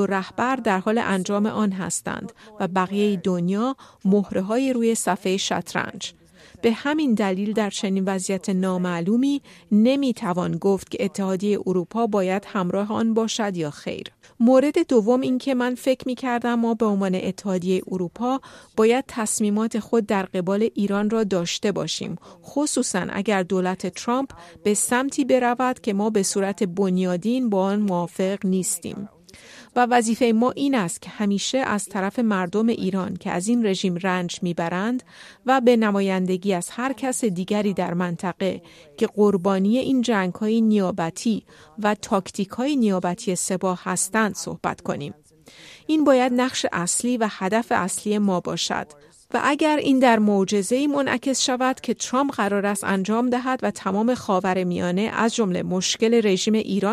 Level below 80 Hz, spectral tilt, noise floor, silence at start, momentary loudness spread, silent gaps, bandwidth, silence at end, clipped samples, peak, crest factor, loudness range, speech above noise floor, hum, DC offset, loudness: -62 dBFS; -5 dB/octave; -48 dBFS; 0 s; 8 LU; none; 14.5 kHz; 0 s; under 0.1%; -4 dBFS; 18 dB; 3 LU; 26 dB; none; under 0.1%; -22 LUFS